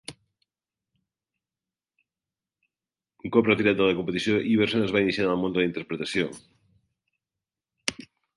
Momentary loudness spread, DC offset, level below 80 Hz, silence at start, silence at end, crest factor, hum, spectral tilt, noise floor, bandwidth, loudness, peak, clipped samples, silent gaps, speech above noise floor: 11 LU; under 0.1%; -60 dBFS; 0.1 s; 0.45 s; 24 dB; none; -5.5 dB/octave; under -90 dBFS; 11.5 kHz; -25 LUFS; -4 dBFS; under 0.1%; none; over 66 dB